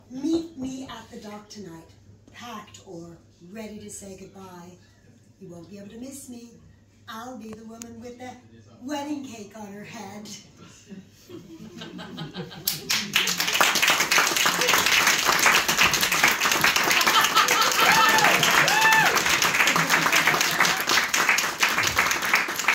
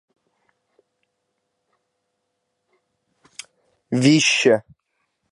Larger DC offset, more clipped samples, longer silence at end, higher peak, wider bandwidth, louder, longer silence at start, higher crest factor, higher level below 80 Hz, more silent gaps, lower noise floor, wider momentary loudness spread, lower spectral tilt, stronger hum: neither; neither; second, 0 s vs 0.7 s; about the same, -2 dBFS vs -2 dBFS; first, 17 kHz vs 11.5 kHz; about the same, -19 LUFS vs -17 LUFS; second, 0.1 s vs 3.9 s; about the same, 22 dB vs 22 dB; first, -58 dBFS vs -70 dBFS; neither; second, -55 dBFS vs -75 dBFS; about the same, 23 LU vs 25 LU; second, -1 dB/octave vs -4 dB/octave; neither